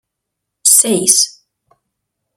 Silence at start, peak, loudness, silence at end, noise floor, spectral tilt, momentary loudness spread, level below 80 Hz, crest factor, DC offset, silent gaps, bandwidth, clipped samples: 0.65 s; 0 dBFS; -10 LUFS; 1.05 s; -77 dBFS; -1.5 dB/octave; 7 LU; -66 dBFS; 16 dB; under 0.1%; none; over 20 kHz; 0.2%